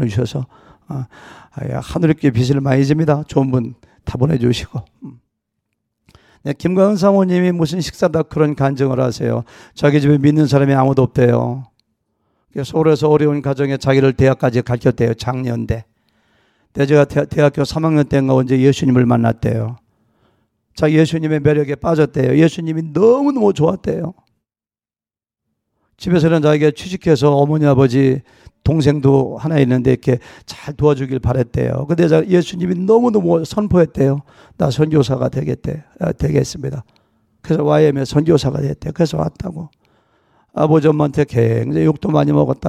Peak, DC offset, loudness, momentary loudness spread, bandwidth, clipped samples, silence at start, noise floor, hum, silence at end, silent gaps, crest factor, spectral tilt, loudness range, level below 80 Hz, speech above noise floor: 0 dBFS; under 0.1%; -15 LUFS; 12 LU; 12.5 kHz; under 0.1%; 0 s; under -90 dBFS; none; 0 s; none; 14 dB; -7.5 dB/octave; 4 LU; -40 dBFS; over 75 dB